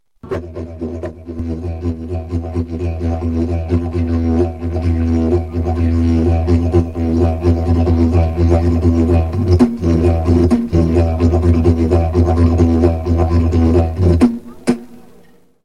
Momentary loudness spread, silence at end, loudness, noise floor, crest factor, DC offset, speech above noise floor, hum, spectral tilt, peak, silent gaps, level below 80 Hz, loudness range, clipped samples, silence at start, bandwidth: 10 LU; 0.65 s; -15 LUFS; -48 dBFS; 14 dB; 0.7%; 34 dB; none; -9.5 dB/octave; 0 dBFS; none; -22 dBFS; 6 LU; under 0.1%; 0.25 s; 9.6 kHz